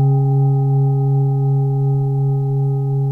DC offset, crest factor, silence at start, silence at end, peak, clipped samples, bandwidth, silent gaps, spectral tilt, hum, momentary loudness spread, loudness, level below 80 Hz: under 0.1%; 8 dB; 0 s; 0 s; -8 dBFS; under 0.1%; 1.3 kHz; none; -13.5 dB/octave; none; 3 LU; -17 LUFS; -50 dBFS